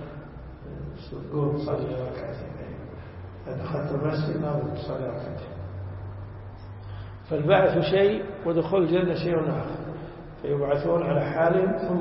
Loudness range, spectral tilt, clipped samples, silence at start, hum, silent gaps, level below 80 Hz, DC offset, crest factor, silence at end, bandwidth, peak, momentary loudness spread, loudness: 9 LU; -11.5 dB/octave; under 0.1%; 0 s; none; none; -48 dBFS; under 0.1%; 20 dB; 0 s; 5.8 kHz; -8 dBFS; 19 LU; -26 LUFS